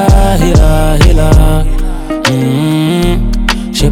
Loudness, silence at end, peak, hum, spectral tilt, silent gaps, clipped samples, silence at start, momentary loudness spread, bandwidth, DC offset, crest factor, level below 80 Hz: -10 LUFS; 0 s; 0 dBFS; none; -6 dB/octave; none; 0.3%; 0 s; 6 LU; 16 kHz; under 0.1%; 8 dB; -10 dBFS